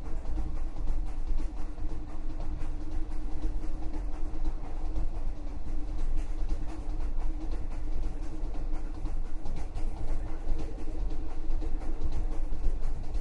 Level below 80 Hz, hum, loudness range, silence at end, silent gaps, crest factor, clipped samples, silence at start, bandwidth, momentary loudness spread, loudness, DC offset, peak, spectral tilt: -30 dBFS; none; 1 LU; 0 s; none; 14 dB; under 0.1%; 0 s; 4.1 kHz; 3 LU; -39 LUFS; under 0.1%; -12 dBFS; -7.5 dB/octave